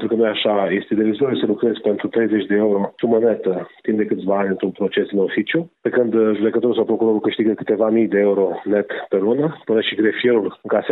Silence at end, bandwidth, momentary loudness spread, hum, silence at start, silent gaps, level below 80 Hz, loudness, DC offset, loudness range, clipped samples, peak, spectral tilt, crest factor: 0 s; 4.1 kHz; 5 LU; none; 0 s; none; -66 dBFS; -19 LUFS; under 0.1%; 2 LU; under 0.1%; -4 dBFS; -10 dB/octave; 14 dB